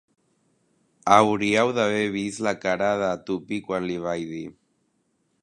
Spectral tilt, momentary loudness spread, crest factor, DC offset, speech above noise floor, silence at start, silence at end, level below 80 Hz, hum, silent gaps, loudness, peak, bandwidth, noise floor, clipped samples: -5 dB/octave; 13 LU; 24 dB; under 0.1%; 47 dB; 1.05 s; 0.9 s; -62 dBFS; none; none; -23 LUFS; 0 dBFS; 11.5 kHz; -70 dBFS; under 0.1%